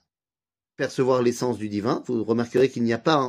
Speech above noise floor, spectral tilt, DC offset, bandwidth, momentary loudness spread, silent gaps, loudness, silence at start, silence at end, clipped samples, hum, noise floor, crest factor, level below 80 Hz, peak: over 67 dB; -6 dB/octave; under 0.1%; 15.5 kHz; 6 LU; none; -24 LUFS; 0.8 s; 0 s; under 0.1%; none; under -90 dBFS; 20 dB; -66 dBFS; -4 dBFS